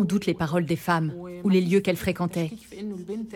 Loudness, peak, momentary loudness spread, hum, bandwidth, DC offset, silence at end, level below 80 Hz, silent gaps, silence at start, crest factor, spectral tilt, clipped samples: -26 LUFS; -8 dBFS; 12 LU; none; 17 kHz; under 0.1%; 0 s; -56 dBFS; none; 0 s; 16 dB; -6.5 dB/octave; under 0.1%